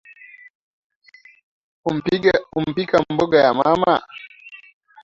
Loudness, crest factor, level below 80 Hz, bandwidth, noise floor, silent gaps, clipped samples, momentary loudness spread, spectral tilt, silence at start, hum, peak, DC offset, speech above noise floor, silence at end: -18 LUFS; 20 dB; -54 dBFS; 7.6 kHz; -45 dBFS; none; under 0.1%; 22 LU; -6.5 dB/octave; 1.85 s; none; -2 dBFS; under 0.1%; 27 dB; 0.5 s